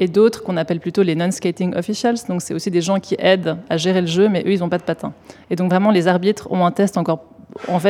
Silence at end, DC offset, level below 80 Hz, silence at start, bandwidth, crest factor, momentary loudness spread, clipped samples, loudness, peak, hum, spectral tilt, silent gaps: 0 s; under 0.1%; -58 dBFS; 0 s; 15 kHz; 16 dB; 8 LU; under 0.1%; -18 LUFS; 0 dBFS; none; -6 dB/octave; none